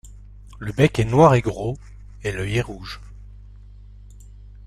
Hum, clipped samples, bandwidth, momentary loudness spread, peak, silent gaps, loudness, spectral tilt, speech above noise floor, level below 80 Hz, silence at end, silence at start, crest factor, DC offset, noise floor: 50 Hz at -40 dBFS; under 0.1%; 13.5 kHz; 21 LU; -2 dBFS; none; -20 LUFS; -7 dB/octave; 23 dB; -40 dBFS; 0.05 s; 0.05 s; 22 dB; under 0.1%; -42 dBFS